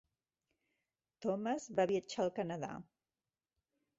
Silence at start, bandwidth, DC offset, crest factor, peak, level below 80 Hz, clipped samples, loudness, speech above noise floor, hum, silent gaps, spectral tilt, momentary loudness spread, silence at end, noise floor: 1.2 s; 7.6 kHz; under 0.1%; 20 dB; -22 dBFS; -78 dBFS; under 0.1%; -38 LUFS; over 53 dB; none; none; -5 dB/octave; 10 LU; 1.15 s; under -90 dBFS